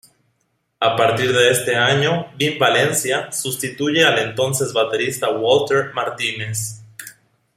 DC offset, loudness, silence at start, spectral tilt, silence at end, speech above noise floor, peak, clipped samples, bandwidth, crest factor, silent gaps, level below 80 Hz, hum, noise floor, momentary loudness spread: under 0.1%; -18 LUFS; 0.8 s; -3 dB/octave; 0.45 s; 50 dB; 0 dBFS; under 0.1%; 16 kHz; 18 dB; none; -60 dBFS; none; -69 dBFS; 9 LU